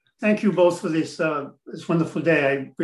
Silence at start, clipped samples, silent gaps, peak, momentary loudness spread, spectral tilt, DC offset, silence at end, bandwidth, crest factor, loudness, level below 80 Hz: 0.2 s; under 0.1%; none; -6 dBFS; 9 LU; -6.5 dB/octave; under 0.1%; 0 s; 12 kHz; 16 dB; -22 LUFS; -70 dBFS